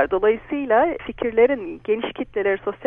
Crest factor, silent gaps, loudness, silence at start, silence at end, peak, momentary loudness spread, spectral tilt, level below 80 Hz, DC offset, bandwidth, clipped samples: 16 dB; none; -21 LUFS; 0 s; 0 s; -4 dBFS; 8 LU; -8.5 dB/octave; -50 dBFS; under 0.1%; 3.7 kHz; under 0.1%